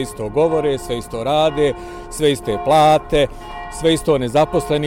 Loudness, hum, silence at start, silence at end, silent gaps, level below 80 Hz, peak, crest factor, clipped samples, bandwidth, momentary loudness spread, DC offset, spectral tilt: -17 LUFS; none; 0 s; 0 s; none; -36 dBFS; -4 dBFS; 12 dB; under 0.1%; 17 kHz; 11 LU; under 0.1%; -5 dB/octave